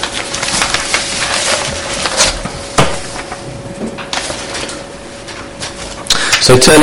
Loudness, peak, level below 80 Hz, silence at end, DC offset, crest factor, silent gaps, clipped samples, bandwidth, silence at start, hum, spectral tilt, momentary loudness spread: -13 LUFS; 0 dBFS; -32 dBFS; 0 s; under 0.1%; 14 dB; none; 0.4%; over 20 kHz; 0 s; none; -2.5 dB/octave; 17 LU